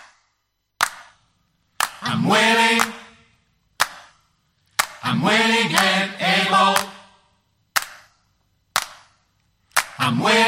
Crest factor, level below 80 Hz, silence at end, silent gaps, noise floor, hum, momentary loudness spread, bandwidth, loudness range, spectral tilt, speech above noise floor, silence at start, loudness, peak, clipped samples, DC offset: 22 dB; -64 dBFS; 0 s; none; -72 dBFS; 50 Hz at -60 dBFS; 10 LU; 16.5 kHz; 6 LU; -3 dB/octave; 55 dB; 0.8 s; -19 LUFS; 0 dBFS; under 0.1%; under 0.1%